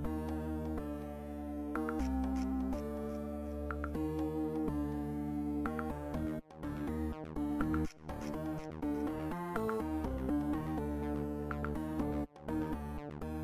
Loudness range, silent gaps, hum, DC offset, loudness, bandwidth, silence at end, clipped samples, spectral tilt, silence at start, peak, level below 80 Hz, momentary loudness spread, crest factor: 1 LU; none; none; under 0.1%; -39 LUFS; 15.5 kHz; 0 s; under 0.1%; -8 dB/octave; 0 s; -18 dBFS; -46 dBFS; 6 LU; 18 dB